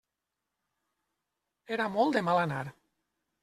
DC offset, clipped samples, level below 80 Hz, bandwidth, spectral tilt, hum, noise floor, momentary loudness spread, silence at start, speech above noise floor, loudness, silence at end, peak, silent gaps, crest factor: under 0.1%; under 0.1%; -72 dBFS; 14 kHz; -6.5 dB/octave; none; -87 dBFS; 11 LU; 1.7 s; 58 dB; -30 LUFS; 0.7 s; -12 dBFS; none; 22 dB